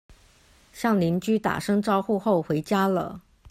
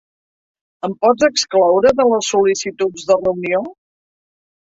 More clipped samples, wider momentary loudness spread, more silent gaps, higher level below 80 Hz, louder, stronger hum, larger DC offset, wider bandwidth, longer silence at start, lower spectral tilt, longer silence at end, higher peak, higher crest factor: neither; second, 6 LU vs 9 LU; neither; about the same, -58 dBFS vs -54 dBFS; second, -24 LUFS vs -15 LUFS; neither; neither; first, 15 kHz vs 8 kHz; second, 0.1 s vs 0.85 s; first, -6.5 dB/octave vs -3.5 dB/octave; second, 0.3 s vs 1.05 s; second, -10 dBFS vs -2 dBFS; about the same, 16 dB vs 16 dB